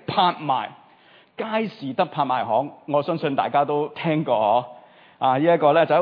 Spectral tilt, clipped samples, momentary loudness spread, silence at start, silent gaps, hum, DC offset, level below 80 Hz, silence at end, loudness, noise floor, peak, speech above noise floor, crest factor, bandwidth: -9 dB/octave; under 0.1%; 9 LU; 0.1 s; none; none; under 0.1%; -76 dBFS; 0 s; -22 LUFS; -53 dBFS; -4 dBFS; 32 dB; 18 dB; 5.2 kHz